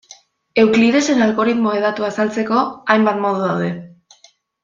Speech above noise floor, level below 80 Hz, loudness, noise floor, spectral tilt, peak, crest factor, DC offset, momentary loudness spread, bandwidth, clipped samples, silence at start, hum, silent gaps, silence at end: 37 dB; -60 dBFS; -16 LUFS; -53 dBFS; -5.5 dB/octave; -2 dBFS; 16 dB; under 0.1%; 8 LU; 7.6 kHz; under 0.1%; 0.55 s; none; none; 0.75 s